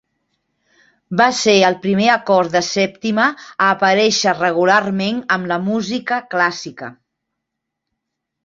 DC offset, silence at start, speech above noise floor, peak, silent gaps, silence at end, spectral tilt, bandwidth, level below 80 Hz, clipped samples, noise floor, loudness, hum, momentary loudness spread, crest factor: under 0.1%; 1.1 s; 63 dB; 0 dBFS; none; 1.5 s; -4 dB/octave; 8 kHz; -60 dBFS; under 0.1%; -79 dBFS; -16 LUFS; none; 7 LU; 16 dB